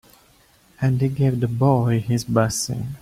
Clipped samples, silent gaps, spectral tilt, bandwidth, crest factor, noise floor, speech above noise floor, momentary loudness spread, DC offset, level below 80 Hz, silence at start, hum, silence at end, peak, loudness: under 0.1%; none; -6 dB/octave; 15.5 kHz; 18 dB; -55 dBFS; 36 dB; 6 LU; under 0.1%; -50 dBFS; 0.8 s; none; 0.05 s; -4 dBFS; -21 LUFS